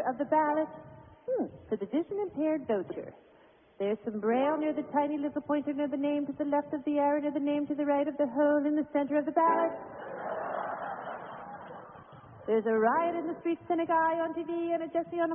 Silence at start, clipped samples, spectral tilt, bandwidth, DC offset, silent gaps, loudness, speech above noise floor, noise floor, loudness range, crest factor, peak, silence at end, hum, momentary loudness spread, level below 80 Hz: 0 s; under 0.1%; -1 dB/octave; 3.6 kHz; under 0.1%; none; -31 LUFS; 30 dB; -60 dBFS; 5 LU; 16 dB; -14 dBFS; 0 s; none; 15 LU; -70 dBFS